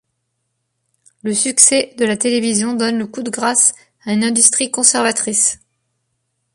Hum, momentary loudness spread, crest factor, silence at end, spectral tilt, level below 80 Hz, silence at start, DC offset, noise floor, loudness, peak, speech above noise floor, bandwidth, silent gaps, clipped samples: none; 11 LU; 18 dB; 1 s; -2 dB/octave; -62 dBFS; 1.25 s; under 0.1%; -71 dBFS; -14 LUFS; 0 dBFS; 56 dB; 15 kHz; none; under 0.1%